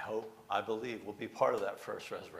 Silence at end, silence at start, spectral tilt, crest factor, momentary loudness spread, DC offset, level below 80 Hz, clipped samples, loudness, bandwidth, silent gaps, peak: 0 s; 0 s; -5 dB/octave; 22 dB; 10 LU; under 0.1%; -78 dBFS; under 0.1%; -37 LUFS; 15.5 kHz; none; -16 dBFS